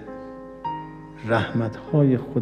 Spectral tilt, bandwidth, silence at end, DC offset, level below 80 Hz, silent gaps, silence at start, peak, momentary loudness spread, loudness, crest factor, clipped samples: -9 dB/octave; 9.2 kHz; 0 s; under 0.1%; -54 dBFS; none; 0 s; -8 dBFS; 18 LU; -24 LUFS; 18 dB; under 0.1%